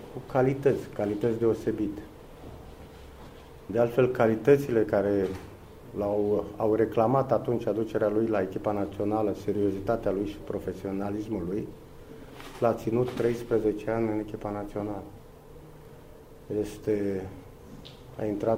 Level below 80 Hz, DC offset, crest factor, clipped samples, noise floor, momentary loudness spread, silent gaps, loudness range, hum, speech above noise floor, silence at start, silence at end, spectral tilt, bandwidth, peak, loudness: -52 dBFS; under 0.1%; 20 dB; under 0.1%; -49 dBFS; 23 LU; none; 8 LU; none; 21 dB; 0 s; 0 s; -8 dB/octave; 16 kHz; -8 dBFS; -28 LUFS